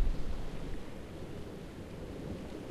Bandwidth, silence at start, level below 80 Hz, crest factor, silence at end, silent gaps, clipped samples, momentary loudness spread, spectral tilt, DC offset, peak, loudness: 13 kHz; 0 s; -40 dBFS; 18 dB; 0 s; none; under 0.1%; 4 LU; -6.5 dB/octave; under 0.1%; -18 dBFS; -44 LUFS